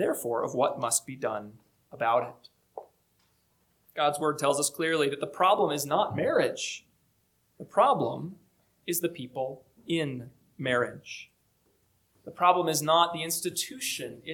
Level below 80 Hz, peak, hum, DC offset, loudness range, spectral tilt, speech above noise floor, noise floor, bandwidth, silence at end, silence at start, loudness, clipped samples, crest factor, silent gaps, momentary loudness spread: -74 dBFS; -8 dBFS; none; under 0.1%; 6 LU; -3 dB/octave; 43 dB; -71 dBFS; 19 kHz; 0 s; 0 s; -28 LUFS; under 0.1%; 22 dB; none; 19 LU